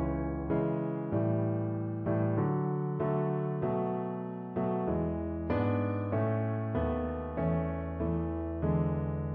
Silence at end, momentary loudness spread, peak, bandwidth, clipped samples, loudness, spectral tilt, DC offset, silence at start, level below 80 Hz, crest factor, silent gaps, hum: 0 s; 4 LU; -18 dBFS; 4.4 kHz; under 0.1%; -32 LUFS; -12.5 dB/octave; under 0.1%; 0 s; -48 dBFS; 14 dB; none; none